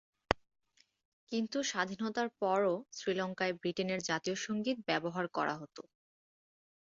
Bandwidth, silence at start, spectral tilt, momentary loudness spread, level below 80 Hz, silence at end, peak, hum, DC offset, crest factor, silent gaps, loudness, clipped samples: 7.6 kHz; 0.3 s; -3 dB/octave; 5 LU; -64 dBFS; 1 s; -8 dBFS; none; under 0.1%; 30 dB; 1.05-1.27 s; -36 LUFS; under 0.1%